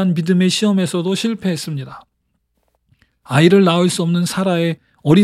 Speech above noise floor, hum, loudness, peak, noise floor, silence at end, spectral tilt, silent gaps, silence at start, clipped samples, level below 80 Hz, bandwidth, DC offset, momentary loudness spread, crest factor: 53 dB; none; -16 LUFS; 0 dBFS; -68 dBFS; 0 s; -6 dB/octave; none; 0 s; under 0.1%; -58 dBFS; 14 kHz; under 0.1%; 12 LU; 16 dB